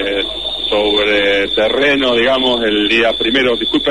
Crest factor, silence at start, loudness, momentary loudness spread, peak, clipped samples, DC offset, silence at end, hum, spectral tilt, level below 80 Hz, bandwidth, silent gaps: 12 dB; 0 s; -13 LUFS; 5 LU; -2 dBFS; under 0.1%; 0.8%; 0 s; none; -4 dB/octave; -40 dBFS; 11.5 kHz; none